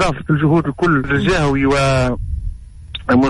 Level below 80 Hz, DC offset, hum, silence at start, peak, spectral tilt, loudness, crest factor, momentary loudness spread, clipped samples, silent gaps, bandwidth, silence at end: -30 dBFS; under 0.1%; none; 0 s; -4 dBFS; -6.5 dB/octave; -16 LUFS; 12 dB; 13 LU; under 0.1%; none; 11.5 kHz; 0 s